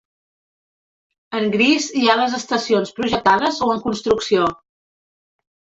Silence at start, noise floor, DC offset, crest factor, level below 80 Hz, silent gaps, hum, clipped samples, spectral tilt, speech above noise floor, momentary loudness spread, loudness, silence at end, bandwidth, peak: 1.3 s; under -90 dBFS; under 0.1%; 18 dB; -54 dBFS; none; none; under 0.1%; -4 dB/octave; over 72 dB; 6 LU; -18 LUFS; 1.2 s; 8 kHz; -2 dBFS